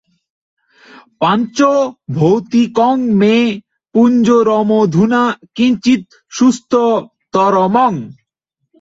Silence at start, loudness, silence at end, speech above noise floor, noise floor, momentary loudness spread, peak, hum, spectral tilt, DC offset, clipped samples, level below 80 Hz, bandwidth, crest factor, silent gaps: 1.2 s; -13 LUFS; 0.7 s; 61 dB; -73 dBFS; 8 LU; -2 dBFS; none; -6.5 dB/octave; under 0.1%; under 0.1%; -56 dBFS; 7.8 kHz; 12 dB; none